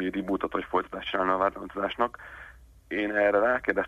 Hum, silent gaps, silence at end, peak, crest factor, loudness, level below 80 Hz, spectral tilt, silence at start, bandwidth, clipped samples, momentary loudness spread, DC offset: none; none; 0 s; -10 dBFS; 18 dB; -28 LUFS; -54 dBFS; -6.5 dB/octave; 0 s; 13 kHz; under 0.1%; 11 LU; under 0.1%